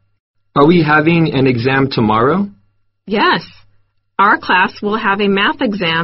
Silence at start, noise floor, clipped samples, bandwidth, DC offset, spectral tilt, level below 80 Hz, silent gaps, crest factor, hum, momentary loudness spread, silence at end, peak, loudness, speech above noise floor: 0.55 s; -57 dBFS; under 0.1%; 6 kHz; under 0.1%; -4 dB/octave; -44 dBFS; none; 14 dB; none; 8 LU; 0 s; 0 dBFS; -13 LUFS; 45 dB